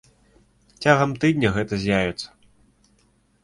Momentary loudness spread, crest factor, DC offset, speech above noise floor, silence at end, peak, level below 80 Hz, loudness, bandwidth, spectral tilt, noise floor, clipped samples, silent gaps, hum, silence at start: 11 LU; 22 dB; under 0.1%; 41 dB; 1.2 s; -2 dBFS; -48 dBFS; -21 LUFS; 11.5 kHz; -6 dB/octave; -62 dBFS; under 0.1%; none; none; 0.8 s